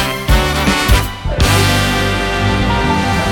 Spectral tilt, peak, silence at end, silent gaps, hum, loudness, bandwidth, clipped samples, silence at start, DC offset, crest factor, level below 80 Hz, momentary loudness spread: -4.5 dB/octave; 0 dBFS; 0 s; none; none; -14 LUFS; 19.5 kHz; under 0.1%; 0 s; under 0.1%; 12 dB; -20 dBFS; 4 LU